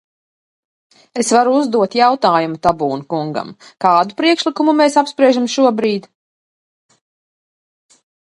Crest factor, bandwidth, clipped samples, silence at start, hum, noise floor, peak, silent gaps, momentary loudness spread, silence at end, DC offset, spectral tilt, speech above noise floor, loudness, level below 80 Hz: 16 dB; 11.5 kHz; under 0.1%; 1.15 s; none; under -90 dBFS; 0 dBFS; none; 9 LU; 2.4 s; under 0.1%; -4.5 dB/octave; over 76 dB; -15 LUFS; -56 dBFS